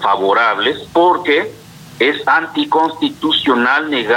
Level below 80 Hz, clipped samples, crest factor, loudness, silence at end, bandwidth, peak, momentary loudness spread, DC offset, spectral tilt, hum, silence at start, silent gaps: -56 dBFS; under 0.1%; 12 dB; -14 LUFS; 0 s; 17 kHz; -2 dBFS; 4 LU; under 0.1%; -4.5 dB/octave; none; 0 s; none